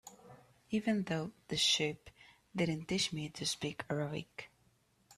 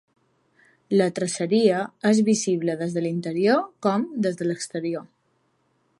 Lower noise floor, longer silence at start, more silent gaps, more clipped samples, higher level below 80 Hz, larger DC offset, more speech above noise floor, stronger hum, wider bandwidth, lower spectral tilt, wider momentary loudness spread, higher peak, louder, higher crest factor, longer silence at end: first, -72 dBFS vs -68 dBFS; second, 0.05 s vs 0.9 s; neither; neither; about the same, -68 dBFS vs -72 dBFS; neither; second, 36 dB vs 46 dB; neither; first, 14 kHz vs 11.5 kHz; second, -3.5 dB/octave vs -5.5 dB/octave; first, 20 LU vs 8 LU; second, -20 dBFS vs -6 dBFS; second, -36 LUFS vs -23 LUFS; about the same, 18 dB vs 18 dB; second, 0.05 s vs 0.95 s